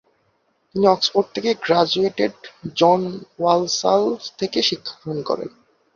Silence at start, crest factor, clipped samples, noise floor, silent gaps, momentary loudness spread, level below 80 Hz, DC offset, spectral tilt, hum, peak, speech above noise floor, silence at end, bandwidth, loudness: 0.75 s; 18 dB; under 0.1%; -66 dBFS; none; 12 LU; -62 dBFS; under 0.1%; -4 dB/octave; none; -2 dBFS; 46 dB; 0.45 s; 7.4 kHz; -20 LUFS